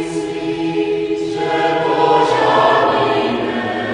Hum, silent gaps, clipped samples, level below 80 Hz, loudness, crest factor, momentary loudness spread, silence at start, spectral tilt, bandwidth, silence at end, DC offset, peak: none; none; under 0.1%; -52 dBFS; -16 LUFS; 14 dB; 8 LU; 0 s; -5.5 dB/octave; 10.5 kHz; 0 s; under 0.1%; -2 dBFS